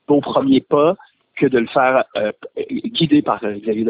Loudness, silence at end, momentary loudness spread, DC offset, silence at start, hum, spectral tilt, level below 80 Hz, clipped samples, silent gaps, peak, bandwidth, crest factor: -17 LUFS; 0 s; 10 LU; under 0.1%; 0.1 s; none; -10.5 dB/octave; -56 dBFS; under 0.1%; none; -2 dBFS; 4 kHz; 14 dB